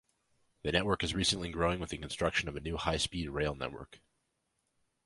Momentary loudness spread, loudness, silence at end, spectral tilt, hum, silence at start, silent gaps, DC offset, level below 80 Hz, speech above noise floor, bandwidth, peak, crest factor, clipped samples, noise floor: 10 LU; -34 LUFS; 1.1 s; -4 dB/octave; none; 0.65 s; none; under 0.1%; -50 dBFS; 47 dB; 11.5 kHz; -12 dBFS; 24 dB; under 0.1%; -81 dBFS